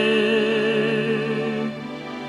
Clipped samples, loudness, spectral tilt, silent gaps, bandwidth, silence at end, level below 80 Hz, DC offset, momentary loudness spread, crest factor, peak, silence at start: under 0.1%; -22 LUFS; -6 dB/octave; none; 11.5 kHz; 0 s; -64 dBFS; under 0.1%; 11 LU; 14 dB; -8 dBFS; 0 s